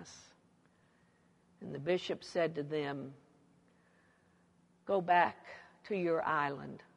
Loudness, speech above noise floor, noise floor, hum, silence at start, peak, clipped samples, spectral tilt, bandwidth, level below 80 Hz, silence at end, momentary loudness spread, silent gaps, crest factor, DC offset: -35 LUFS; 35 dB; -70 dBFS; none; 0 s; -16 dBFS; under 0.1%; -5.5 dB/octave; 11 kHz; -80 dBFS; 0.2 s; 22 LU; none; 22 dB; under 0.1%